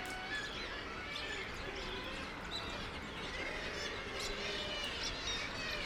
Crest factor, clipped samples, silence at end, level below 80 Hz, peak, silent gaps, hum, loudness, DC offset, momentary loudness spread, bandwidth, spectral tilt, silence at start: 16 dB; under 0.1%; 0 s; -52 dBFS; -26 dBFS; none; none; -40 LUFS; under 0.1%; 4 LU; 19.5 kHz; -2.5 dB/octave; 0 s